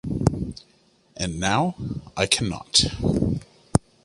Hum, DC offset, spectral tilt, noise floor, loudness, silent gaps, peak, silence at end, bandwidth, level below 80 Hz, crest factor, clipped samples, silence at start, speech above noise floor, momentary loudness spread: none; under 0.1%; -4 dB/octave; -60 dBFS; -24 LUFS; none; -2 dBFS; 0.25 s; 11.5 kHz; -40 dBFS; 22 dB; under 0.1%; 0.05 s; 37 dB; 13 LU